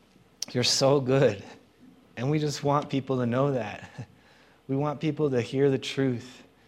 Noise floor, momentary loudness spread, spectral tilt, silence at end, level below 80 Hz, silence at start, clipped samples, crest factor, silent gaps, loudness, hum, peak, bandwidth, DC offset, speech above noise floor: -58 dBFS; 18 LU; -5 dB/octave; 0.25 s; -68 dBFS; 0.4 s; under 0.1%; 20 dB; none; -26 LUFS; none; -8 dBFS; 14.5 kHz; under 0.1%; 32 dB